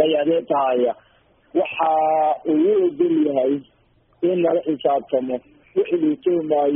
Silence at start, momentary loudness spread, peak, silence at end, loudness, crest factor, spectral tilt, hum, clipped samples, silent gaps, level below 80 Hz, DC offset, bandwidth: 0 s; 7 LU; -4 dBFS; 0 s; -20 LUFS; 14 dB; -3 dB/octave; none; under 0.1%; none; -64 dBFS; under 0.1%; 3.6 kHz